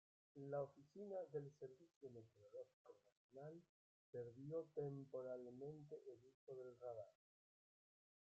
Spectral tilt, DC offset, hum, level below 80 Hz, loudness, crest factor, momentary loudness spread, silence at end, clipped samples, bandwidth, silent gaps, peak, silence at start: -9 dB/octave; under 0.1%; none; under -90 dBFS; -55 LUFS; 18 dB; 14 LU; 1.25 s; under 0.1%; 7.6 kHz; 1.96-2.01 s, 2.73-2.85 s, 3.12-3.29 s, 3.69-4.13 s, 6.34-6.47 s; -38 dBFS; 0.35 s